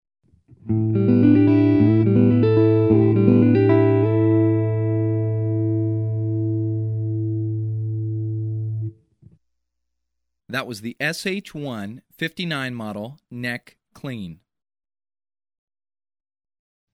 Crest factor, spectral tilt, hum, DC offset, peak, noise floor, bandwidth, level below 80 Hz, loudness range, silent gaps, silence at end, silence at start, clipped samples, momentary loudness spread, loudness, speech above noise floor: 20 dB; -8.5 dB/octave; none; under 0.1%; -2 dBFS; -81 dBFS; 11 kHz; -54 dBFS; 16 LU; none; 2.6 s; 0.65 s; under 0.1%; 16 LU; -20 LUFS; 55 dB